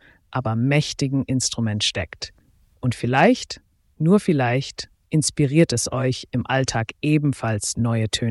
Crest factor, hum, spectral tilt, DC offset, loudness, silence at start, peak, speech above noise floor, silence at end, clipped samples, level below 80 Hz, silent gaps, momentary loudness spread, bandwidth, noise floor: 18 dB; none; -5 dB/octave; under 0.1%; -21 LUFS; 0.3 s; -4 dBFS; 28 dB; 0 s; under 0.1%; -50 dBFS; none; 12 LU; 12 kHz; -49 dBFS